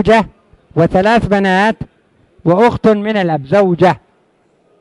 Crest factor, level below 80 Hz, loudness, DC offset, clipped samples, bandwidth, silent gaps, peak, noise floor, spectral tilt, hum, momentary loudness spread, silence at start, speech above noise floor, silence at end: 14 dB; -38 dBFS; -13 LUFS; under 0.1%; under 0.1%; 11.5 kHz; none; 0 dBFS; -55 dBFS; -7 dB/octave; none; 12 LU; 0 s; 44 dB; 0.85 s